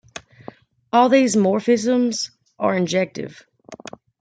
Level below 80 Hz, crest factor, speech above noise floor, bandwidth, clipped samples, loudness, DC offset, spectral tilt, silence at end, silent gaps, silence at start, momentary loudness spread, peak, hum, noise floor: -66 dBFS; 18 dB; 25 dB; 9.4 kHz; under 0.1%; -19 LUFS; under 0.1%; -5 dB/octave; 0.45 s; none; 0.15 s; 23 LU; -4 dBFS; none; -43 dBFS